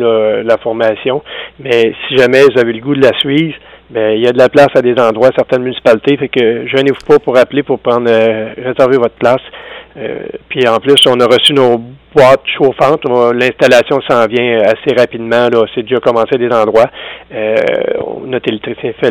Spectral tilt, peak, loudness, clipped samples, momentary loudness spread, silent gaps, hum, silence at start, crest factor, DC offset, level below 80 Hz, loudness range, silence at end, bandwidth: -5 dB/octave; 0 dBFS; -10 LUFS; 0.7%; 12 LU; none; none; 0 s; 10 dB; under 0.1%; -48 dBFS; 3 LU; 0 s; 17 kHz